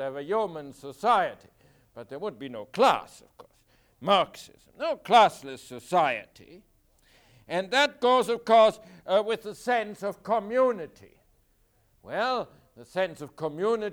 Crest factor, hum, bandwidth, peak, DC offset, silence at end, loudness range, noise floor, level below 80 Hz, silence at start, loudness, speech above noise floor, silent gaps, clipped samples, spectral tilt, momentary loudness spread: 20 dB; none; 19 kHz; -8 dBFS; under 0.1%; 0 s; 6 LU; -66 dBFS; -66 dBFS; 0 s; -26 LUFS; 40 dB; none; under 0.1%; -4 dB/octave; 20 LU